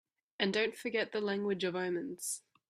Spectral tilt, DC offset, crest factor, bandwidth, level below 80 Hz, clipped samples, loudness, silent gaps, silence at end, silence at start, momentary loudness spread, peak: -3.5 dB/octave; under 0.1%; 22 dB; 15.5 kHz; -80 dBFS; under 0.1%; -35 LUFS; none; 0.3 s; 0.4 s; 7 LU; -14 dBFS